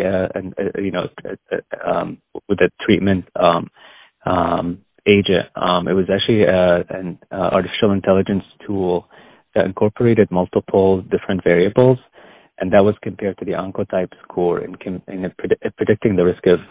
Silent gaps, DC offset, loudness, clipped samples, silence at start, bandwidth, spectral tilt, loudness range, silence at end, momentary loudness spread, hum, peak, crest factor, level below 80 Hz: none; under 0.1%; -18 LUFS; under 0.1%; 0 s; 4 kHz; -11 dB/octave; 4 LU; 0.05 s; 12 LU; none; 0 dBFS; 18 dB; -44 dBFS